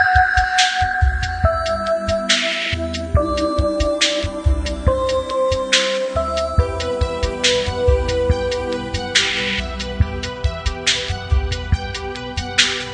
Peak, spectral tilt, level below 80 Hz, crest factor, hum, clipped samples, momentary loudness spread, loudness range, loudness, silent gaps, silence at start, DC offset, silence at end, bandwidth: 0 dBFS; -3.5 dB/octave; -26 dBFS; 18 dB; none; under 0.1%; 7 LU; 2 LU; -19 LUFS; none; 0 s; under 0.1%; 0 s; 10 kHz